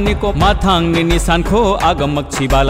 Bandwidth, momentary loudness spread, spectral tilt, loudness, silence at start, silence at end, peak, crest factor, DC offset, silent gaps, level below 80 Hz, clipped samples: 16 kHz; 4 LU; -5.5 dB/octave; -14 LUFS; 0 s; 0 s; -2 dBFS; 10 dB; under 0.1%; none; -20 dBFS; under 0.1%